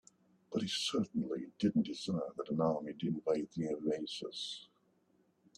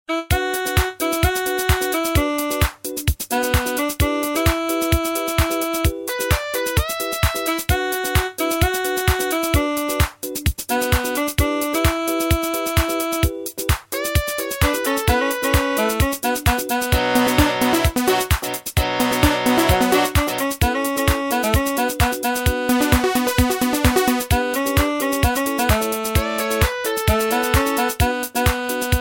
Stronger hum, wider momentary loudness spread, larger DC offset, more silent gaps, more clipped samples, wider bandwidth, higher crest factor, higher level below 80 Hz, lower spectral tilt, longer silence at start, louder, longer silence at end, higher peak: neither; about the same, 7 LU vs 5 LU; neither; neither; neither; second, 12.5 kHz vs 17 kHz; about the same, 18 dB vs 18 dB; second, -76 dBFS vs -28 dBFS; about the same, -5.5 dB/octave vs -4.5 dB/octave; first, 0.5 s vs 0.1 s; second, -37 LUFS vs -19 LUFS; first, 0.95 s vs 0 s; second, -20 dBFS vs -2 dBFS